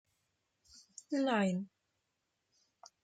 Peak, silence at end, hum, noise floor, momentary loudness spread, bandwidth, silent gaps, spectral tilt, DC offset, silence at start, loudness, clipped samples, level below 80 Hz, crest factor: -22 dBFS; 1.35 s; none; -84 dBFS; 23 LU; 9.2 kHz; none; -6 dB/octave; under 0.1%; 1.1 s; -35 LUFS; under 0.1%; -82 dBFS; 18 dB